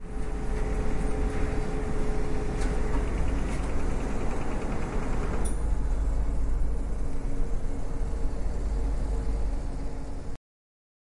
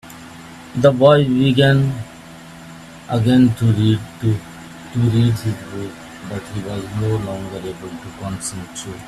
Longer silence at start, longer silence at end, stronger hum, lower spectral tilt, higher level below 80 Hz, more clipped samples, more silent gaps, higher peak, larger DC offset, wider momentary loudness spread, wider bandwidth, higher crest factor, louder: about the same, 0 s vs 0.05 s; first, 0.65 s vs 0 s; neither; about the same, -6.5 dB/octave vs -6.5 dB/octave; first, -28 dBFS vs -46 dBFS; neither; neither; second, -14 dBFS vs 0 dBFS; neither; second, 5 LU vs 24 LU; second, 11 kHz vs 13.5 kHz; second, 12 dB vs 18 dB; second, -33 LUFS vs -17 LUFS